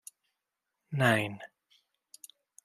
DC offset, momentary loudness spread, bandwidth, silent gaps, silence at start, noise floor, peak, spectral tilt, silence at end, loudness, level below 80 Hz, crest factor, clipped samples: under 0.1%; 25 LU; 15.5 kHz; none; 0.9 s; -86 dBFS; -10 dBFS; -5.5 dB/octave; 1.2 s; -29 LUFS; -78 dBFS; 24 dB; under 0.1%